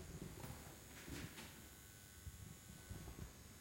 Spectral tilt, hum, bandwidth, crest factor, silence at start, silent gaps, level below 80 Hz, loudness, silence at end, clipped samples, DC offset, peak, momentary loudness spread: -4 dB/octave; none; 16.5 kHz; 16 dB; 0 s; none; -62 dBFS; -55 LUFS; 0 s; under 0.1%; under 0.1%; -38 dBFS; 6 LU